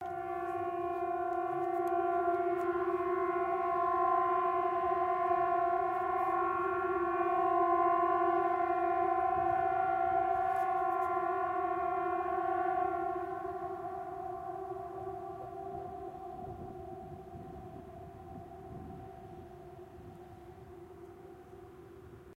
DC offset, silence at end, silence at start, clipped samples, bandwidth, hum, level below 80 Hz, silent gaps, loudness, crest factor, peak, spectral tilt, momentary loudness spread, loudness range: under 0.1%; 0 s; 0 s; under 0.1%; 12.5 kHz; none; -64 dBFS; none; -33 LUFS; 16 dB; -18 dBFS; -7.5 dB/octave; 21 LU; 18 LU